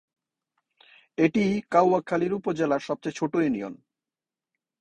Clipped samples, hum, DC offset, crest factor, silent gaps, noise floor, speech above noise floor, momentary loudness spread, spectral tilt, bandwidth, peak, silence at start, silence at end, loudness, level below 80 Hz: under 0.1%; none; under 0.1%; 20 dB; none; under -90 dBFS; over 66 dB; 10 LU; -7 dB/octave; 9.2 kHz; -6 dBFS; 1.2 s; 1.05 s; -25 LUFS; -64 dBFS